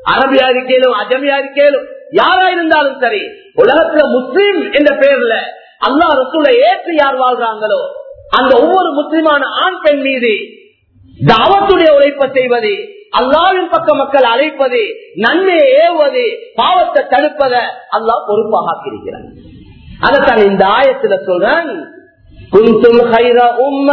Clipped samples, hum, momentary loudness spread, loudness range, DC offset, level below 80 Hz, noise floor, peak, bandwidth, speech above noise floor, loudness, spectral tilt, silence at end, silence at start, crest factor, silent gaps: 0.4%; none; 9 LU; 2 LU; under 0.1%; -44 dBFS; -44 dBFS; 0 dBFS; 6 kHz; 34 dB; -10 LUFS; -7 dB/octave; 0 s; 0.05 s; 10 dB; none